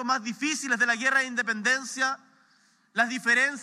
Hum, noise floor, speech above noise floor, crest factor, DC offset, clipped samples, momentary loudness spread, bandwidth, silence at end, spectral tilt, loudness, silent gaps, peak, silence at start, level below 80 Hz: none; -64 dBFS; 37 dB; 18 dB; under 0.1%; under 0.1%; 6 LU; 14.5 kHz; 0 s; -1.5 dB/octave; -25 LUFS; none; -10 dBFS; 0 s; under -90 dBFS